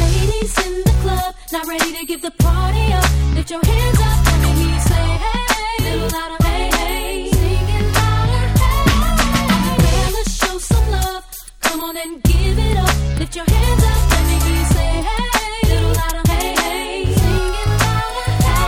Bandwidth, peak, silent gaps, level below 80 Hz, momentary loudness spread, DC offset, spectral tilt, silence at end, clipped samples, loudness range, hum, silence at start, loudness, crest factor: 17 kHz; 0 dBFS; none; -18 dBFS; 6 LU; under 0.1%; -5 dB/octave; 0 s; under 0.1%; 2 LU; none; 0 s; -17 LUFS; 14 dB